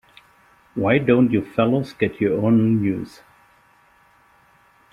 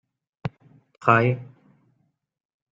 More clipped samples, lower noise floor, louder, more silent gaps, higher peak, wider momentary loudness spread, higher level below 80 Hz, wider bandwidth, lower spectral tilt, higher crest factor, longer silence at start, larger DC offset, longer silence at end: neither; second, -56 dBFS vs -71 dBFS; about the same, -20 LUFS vs -21 LUFS; neither; about the same, -4 dBFS vs -2 dBFS; second, 10 LU vs 17 LU; first, -56 dBFS vs -64 dBFS; about the same, 6.8 kHz vs 7.4 kHz; about the same, -9 dB/octave vs -8.5 dB/octave; second, 18 dB vs 24 dB; first, 0.75 s vs 0.45 s; neither; first, 1.85 s vs 1.3 s